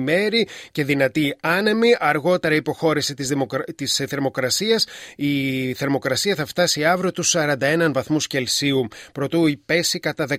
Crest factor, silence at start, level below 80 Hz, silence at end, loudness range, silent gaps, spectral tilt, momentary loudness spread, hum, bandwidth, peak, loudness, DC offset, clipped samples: 16 dB; 0 s; -60 dBFS; 0 s; 2 LU; none; -3.5 dB/octave; 6 LU; none; 16 kHz; -4 dBFS; -20 LUFS; under 0.1%; under 0.1%